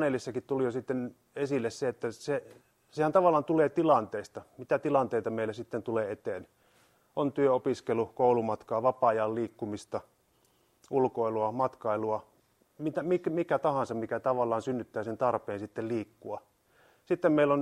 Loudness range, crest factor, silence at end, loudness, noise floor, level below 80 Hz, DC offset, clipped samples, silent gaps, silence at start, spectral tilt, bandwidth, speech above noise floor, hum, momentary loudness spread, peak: 5 LU; 20 dB; 0 s; -31 LUFS; -69 dBFS; -72 dBFS; under 0.1%; under 0.1%; none; 0 s; -7 dB/octave; 13 kHz; 39 dB; none; 12 LU; -10 dBFS